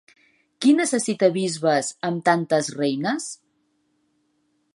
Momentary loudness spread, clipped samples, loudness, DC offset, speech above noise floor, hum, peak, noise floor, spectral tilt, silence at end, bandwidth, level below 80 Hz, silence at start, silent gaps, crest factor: 8 LU; under 0.1%; -22 LUFS; under 0.1%; 48 dB; none; -4 dBFS; -69 dBFS; -4.5 dB/octave; 1.4 s; 11.5 kHz; -76 dBFS; 0.6 s; none; 20 dB